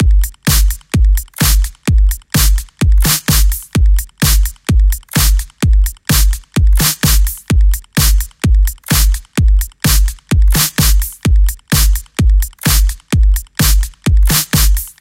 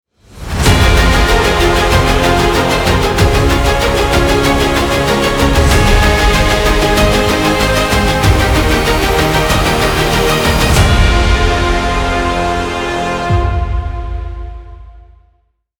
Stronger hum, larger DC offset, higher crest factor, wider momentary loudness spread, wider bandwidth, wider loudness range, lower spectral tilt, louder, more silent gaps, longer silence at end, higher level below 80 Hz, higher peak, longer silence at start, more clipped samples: neither; neither; about the same, 12 dB vs 12 dB; about the same, 4 LU vs 6 LU; second, 17 kHz vs over 20 kHz; second, 1 LU vs 5 LU; about the same, -3.5 dB/octave vs -4.5 dB/octave; about the same, -13 LUFS vs -11 LUFS; neither; second, 0.1 s vs 0.8 s; about the same, -12 dBFS vs -16 dBFS; about the same, 0 dBFS vs 0 dBFS; second, 0 s vs 0.35 s; neither